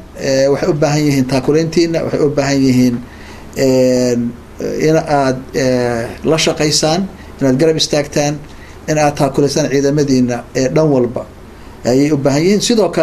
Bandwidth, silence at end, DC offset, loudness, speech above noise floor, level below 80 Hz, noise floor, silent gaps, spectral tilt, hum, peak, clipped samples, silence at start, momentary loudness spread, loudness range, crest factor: 14 kHz; 0 s; under 0.1%; -14 LUFS; 21 dB; -38 dBFS; -34 dBFS; none; -5 dB/octave; none; 0 dBFS; under 0.1%; 0 s; 9 LU; 1 LU; 14 dB